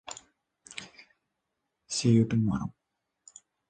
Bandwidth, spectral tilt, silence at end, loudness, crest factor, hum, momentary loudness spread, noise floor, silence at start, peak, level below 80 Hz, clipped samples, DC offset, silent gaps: 9.6 kHz; -6 dB/octave; 1 s; -27 LUFS; 20 dB; none; 21 LU; -83 dBFS; 0.05 s; -12 dBFS; -58 dBFS; under 0.1%; under 0.1%; none